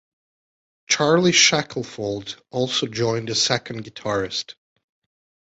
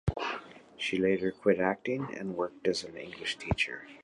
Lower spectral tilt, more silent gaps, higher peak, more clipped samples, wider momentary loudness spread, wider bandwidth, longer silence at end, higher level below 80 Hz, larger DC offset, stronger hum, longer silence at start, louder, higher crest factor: second, -3 dB/octave vs -5.5 dB/octave; neither; first, -2 dBFS vs -12 dBFS; neither; first, 16 LU vs 9 LU; second, 8.2 kHz vs 11 kHz; first, 1.05 s vs 0 s; second, -58 dBFS vs -50 dBFS; neither; neither; first, 0.9 s vs 0.05 s; first, -20 LUFS vs -32 LUFS; about the same, 20 dB vs 20 dB